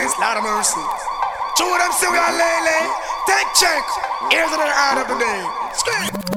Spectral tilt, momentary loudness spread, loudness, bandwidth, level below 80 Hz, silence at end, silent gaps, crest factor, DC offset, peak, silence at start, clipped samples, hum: -1 dB/octave; 8 LU; -17 LUFS; 19 kHz; -48 dBFS; 0 s; none; 18 dB; under 0.1%; 0 dBFS; 0 s; under 0.1%; none